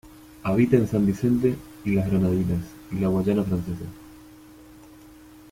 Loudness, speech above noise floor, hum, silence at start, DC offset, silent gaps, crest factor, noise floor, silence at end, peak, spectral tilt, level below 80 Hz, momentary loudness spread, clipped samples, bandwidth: -24 LUFS; 25 dB; none; 0.05 s; under 0.1%; none; 20 dB; -48 dBFS; 0.9 s; -6 dBFS; -8.5 dB/octave; -48 dBFS; 13 LU; under 0.1%; 16 kHz